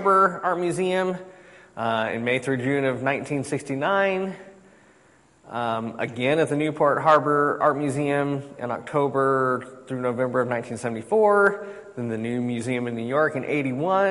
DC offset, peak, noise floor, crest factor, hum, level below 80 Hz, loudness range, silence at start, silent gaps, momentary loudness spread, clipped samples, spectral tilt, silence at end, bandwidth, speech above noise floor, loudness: under 0.1%; -6 dBFS; -57 dBFS; 18 dB; none; -66 dBFS; 4 LU; 0 s; none; 12 LU; under 0.1%; -6 dB/octave; 0 s; 11.5 kHz; 34 dB; -24 LUFS